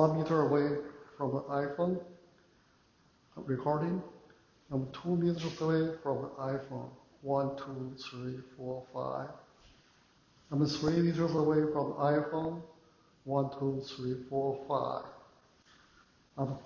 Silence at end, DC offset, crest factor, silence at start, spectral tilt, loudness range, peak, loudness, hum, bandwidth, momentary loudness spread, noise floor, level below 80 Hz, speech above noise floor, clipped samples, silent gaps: 0 s; under 0.1%; 22 dB; 0 s; -7.5 dB/octave; 7 LU; -12 dBFS; -34 LUFS; none; 7.2 kHz; 15 LU; -67 dBFS; -66 dBFS; 34 dB; under 0.1%; none